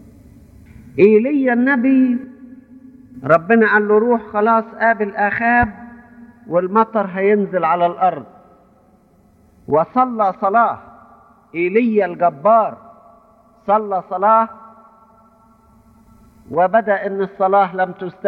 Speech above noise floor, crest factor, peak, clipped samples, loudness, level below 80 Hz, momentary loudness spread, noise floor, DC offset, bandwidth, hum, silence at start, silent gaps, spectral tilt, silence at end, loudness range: 37 dB; 18 dB; 0 dBFS; under 0.1%; -16 LUFS; -50 dBFS; 10 LU; -52 dBFS; under 0.1%; 4.7 kHz; none; 0.95 s; none; -9 dB/octave; 0 s; 5 LU